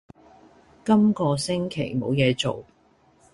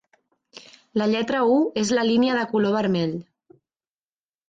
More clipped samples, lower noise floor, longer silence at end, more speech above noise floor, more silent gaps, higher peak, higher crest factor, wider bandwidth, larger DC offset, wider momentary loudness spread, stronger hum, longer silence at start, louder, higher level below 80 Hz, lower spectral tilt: neither; second, -60 dBFS vs under -90 dBFS; second, 0.7 s vs 1.25 s; second, 37 dB vs over 69 dB; neither; first, -6 dBFS vs -10 dBFS; about the same, 18 dB vs 14 dB; first, 11.5 kHz vs 9.2 kHz; neither; about the same, 9 LU vs 7 LU; neither; first, 0.85 s vs 0.55 s; about the same, -23 LUFS vs -22 LUFS; first, -56 dBFS vs -64 dBFS; about the same, -6 dB/octave vs -5.5 dB/octave